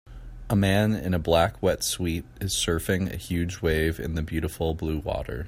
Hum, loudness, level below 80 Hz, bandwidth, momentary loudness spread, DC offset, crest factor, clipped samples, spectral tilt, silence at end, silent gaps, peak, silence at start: none; -26 LUFS; -40 dBFS; 16 kHz; 8 LU; under 0.1%; 18 dB; under 0.1%; -5 dB/octave; 0 s; none; -8 dBFS; 0.05 s